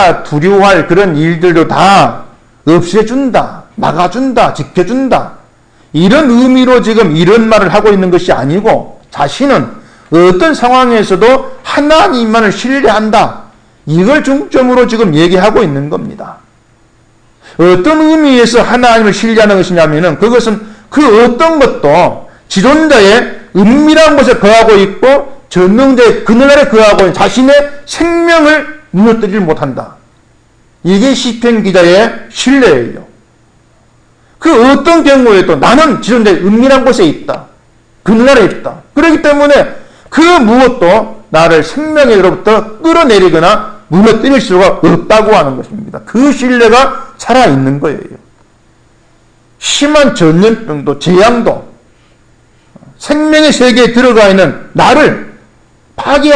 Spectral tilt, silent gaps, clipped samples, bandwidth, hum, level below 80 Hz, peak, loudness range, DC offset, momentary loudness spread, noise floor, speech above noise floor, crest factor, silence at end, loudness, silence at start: -5.5 dB/octave; none; 2%; 11 kHz; none; -32 dBFS; 0 dBFS; 5 LU; under 0.1%; 10 LU; -45 dBFS; 39 dB; 6 dB; 0 s; -7 LUFS; 0 s